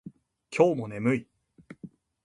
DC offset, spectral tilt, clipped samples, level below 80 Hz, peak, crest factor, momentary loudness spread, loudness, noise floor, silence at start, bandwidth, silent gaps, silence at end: under 0.1%; -7 dB/octave; under 0.1%; -68 dBFS; -8 dBFS; 22 dB; 23 LU; -27 LUFS; -52 dBFS; 0.05 s; 11 kHz; none; 0.35 s